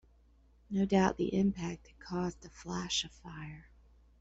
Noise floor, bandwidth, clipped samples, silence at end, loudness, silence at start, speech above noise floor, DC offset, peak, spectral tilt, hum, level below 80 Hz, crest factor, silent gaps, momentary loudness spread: -64 dBFS; 8 kHz; under 0.1%; 0.6 s; -34 LUFS; 0.7 s; 30 dB; under 0.1%; -16 dBFS; -5 dB/octave; none; -56 dBFS; 20 dB; none; 18 LU